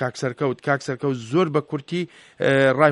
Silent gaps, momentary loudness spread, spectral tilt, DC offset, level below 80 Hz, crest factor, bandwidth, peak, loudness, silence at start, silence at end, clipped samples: none; 10 LU; -6.5 dB/octave; under 0.1%; -64 dBFS; 20 dB; 11.5 kHz; -2 dBFS; -22 LUFS; 0 s; 0 s; under 0.1%